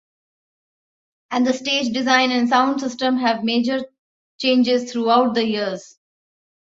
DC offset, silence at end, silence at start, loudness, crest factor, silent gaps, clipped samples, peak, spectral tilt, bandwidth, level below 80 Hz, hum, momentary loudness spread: under 0.1%; 0.85 s; 1.3 s; -19 LUFS; 18 dB; 3.99-4.39 s; under 0.1%; -2 dBFS; -3.5 dB/octave; 7.8 kHz; -66 dBFS; none; 9 LU